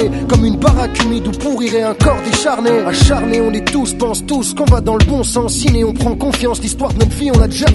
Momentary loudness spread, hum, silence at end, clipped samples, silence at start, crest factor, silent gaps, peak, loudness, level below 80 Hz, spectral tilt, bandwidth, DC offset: 5 LU; none; 0 s; under 0.1%; 0 s; 12 dB; none; 0 dBFS; -14 LUFS; -20 dBFS; -5 dB/octave; 12 kHz; under 0.1%